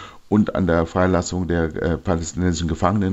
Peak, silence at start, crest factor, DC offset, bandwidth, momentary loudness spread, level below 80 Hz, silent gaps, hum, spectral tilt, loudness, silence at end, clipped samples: -2 dBFS; 0 s; 18 dB; under 0.1%; 8.2 kHz; 4 LU; -40 dBFS; none; none; -6.5 dB/octave; -21 LUFS; 0 s; under 0.1%